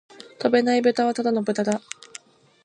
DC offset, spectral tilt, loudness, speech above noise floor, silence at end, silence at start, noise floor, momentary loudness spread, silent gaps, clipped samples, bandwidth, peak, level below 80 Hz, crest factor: under 0.1%; -5 dB/octave; -22 LUFS; 26 dB; 0.85 s; 0.2 s; -47 dBFS; 18 LU; none; under 0.1%; 10.5 kHz; -6 dBFS; -74 dBFS; 18 dB